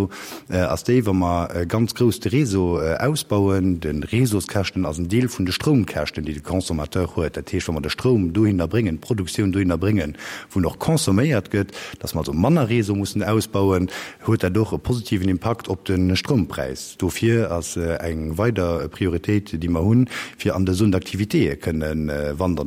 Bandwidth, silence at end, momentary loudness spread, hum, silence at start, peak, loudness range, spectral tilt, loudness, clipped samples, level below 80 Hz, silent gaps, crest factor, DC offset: 16.5 kHz; 0 s; 7 LU; none; 0 s; -4 dBFS; 2 LU; -6 dB/octave; -22 LUFS; under 0.1%; -40 dBFS; none; 16 dB; under 0.1%